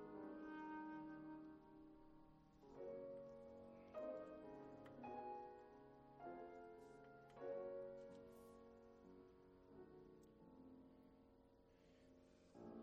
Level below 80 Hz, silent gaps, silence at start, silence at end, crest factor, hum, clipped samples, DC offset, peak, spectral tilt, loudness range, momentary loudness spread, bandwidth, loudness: -80 dBFS; none; 0 s; 0 s; 18 dB; none; under 0.1%; under 0.1%; -40 dBFS; -7 dB/octave; 10 LU; 14 LU; 9 kHz; -58 LUFS